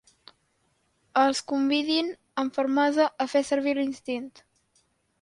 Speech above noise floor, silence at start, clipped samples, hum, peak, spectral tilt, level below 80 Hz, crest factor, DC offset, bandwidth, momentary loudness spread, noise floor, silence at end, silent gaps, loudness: 45 dB; 1.15 s; under 0.1%; none; -10 dBFS; -2.5 dB/octave; -72 dBFS; 18 dB; under 0.1%; 11.5 kHz; 9 LU; -71 dBFS; 0.95 s; none; -26 LUFS